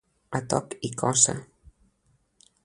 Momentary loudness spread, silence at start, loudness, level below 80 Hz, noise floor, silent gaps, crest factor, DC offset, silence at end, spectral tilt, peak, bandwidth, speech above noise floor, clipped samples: 14 LU; 0.3 s; -25 LUFS; -60 dBFS; -68 dBFS; none; 26 dB; under 0.1%; 1.2 s; -3 dB/octave; -2 dBFS; 11.5 kHz; 42 dB; under 0.1%